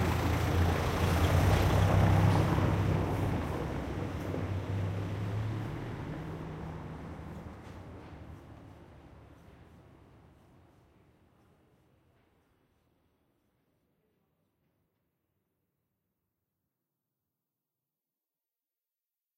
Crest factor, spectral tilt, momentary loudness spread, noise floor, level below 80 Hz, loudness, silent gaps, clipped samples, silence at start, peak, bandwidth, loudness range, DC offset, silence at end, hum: 20 dB; -7 dB/octave; 22 LU; under -90 dBFS; -44 dBFS; -31 LUFS; none; under 0.1%; 0 s; -14 dBFS; 16 kHz; 22 LU; under 0.1%; 10.05 s; none